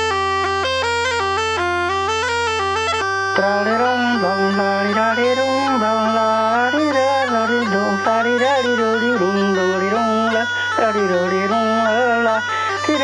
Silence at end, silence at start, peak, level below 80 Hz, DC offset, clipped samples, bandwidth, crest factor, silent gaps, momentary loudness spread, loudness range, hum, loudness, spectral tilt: 0 s; 0 s; -2 dBFS; -52 dBFS; under 0.1%; under 0.1%; 11.5 kHz; 16 dB; none; 2 LU; 1 LU; none; -17 LUFS; -4 dB/octave